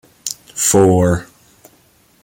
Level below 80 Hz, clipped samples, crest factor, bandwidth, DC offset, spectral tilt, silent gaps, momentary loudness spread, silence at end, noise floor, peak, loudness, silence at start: -44 dBFS; under 0.1%; 16 dB; 17 kHz; under 0.1%; -5 dB/octave; none; 15 LU; 1 s; -53 dBFS; -2 dBFS; -15 LUFS; 0.25 s